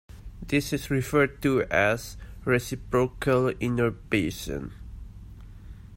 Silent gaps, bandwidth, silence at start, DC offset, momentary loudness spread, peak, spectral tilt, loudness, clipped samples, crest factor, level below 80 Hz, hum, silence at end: none; 16.5 kHz; 0.1 s; under 0.1%; 23 LU; -8 dBFS; -6 dB/octave; -26 LUFS; under 0.1%; 20 dB; -44 dBFS; none; 0 s